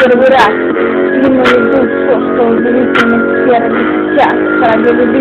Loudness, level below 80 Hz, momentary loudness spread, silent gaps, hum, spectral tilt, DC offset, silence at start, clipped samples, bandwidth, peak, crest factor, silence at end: -9 LUFS; -42 dBFS; 4 LU; none; none; -6.5 dB/octave; under 0.1%; 0 s; 0.3%; 9.4 kHz; 0 dBFS; 8 dB; 0 s